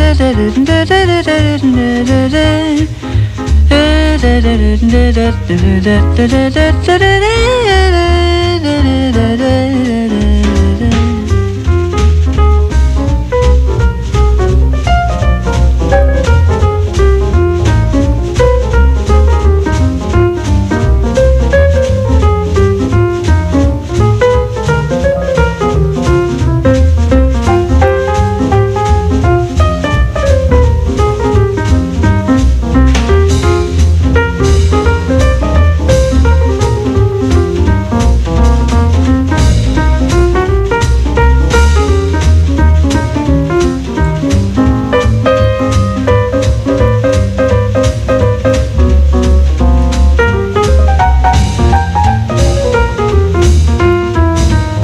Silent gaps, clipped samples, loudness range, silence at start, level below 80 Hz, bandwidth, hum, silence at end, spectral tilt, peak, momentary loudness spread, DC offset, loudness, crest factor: none; under 0.1%; 1 LU; 0 s; -12 dBFS; 11 kHz; none; 0 s; -6.5 dB/octave; 0 dBFS; 3 LU; under 0.1%; -10 LUFS; 8 dB